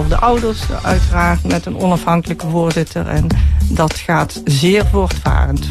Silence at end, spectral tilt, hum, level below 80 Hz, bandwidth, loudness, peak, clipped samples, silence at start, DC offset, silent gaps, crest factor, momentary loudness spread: 0 s; -6 dB/octave; none; -18 dBFS; 13.5 kHz; -15 LUFS; -2 dBFS; under 0.1%; 0 s; under 0.1%; none; 12 dB; 5 LU